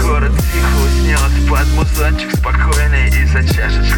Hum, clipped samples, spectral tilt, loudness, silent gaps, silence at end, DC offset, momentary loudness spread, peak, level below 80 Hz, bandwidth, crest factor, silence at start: none; under 0.1%; -5 dB/octave; -14 LUFS; none; 0 s; under 0.1%; 2 LU; -2 dBFS; -12 dBFS; 18.5 kHz; 10 dB; 0 s